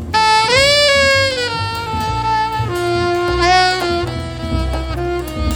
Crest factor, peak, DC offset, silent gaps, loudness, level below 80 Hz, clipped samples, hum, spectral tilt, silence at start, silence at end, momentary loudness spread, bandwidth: 16 dB; 0 dBFS; under 0.1%; none; -15 LUFS; -28 dBFS; under 0.1%; none; -4 dB/octave; 0 s; 0 s; 11 LU; over 20 kHz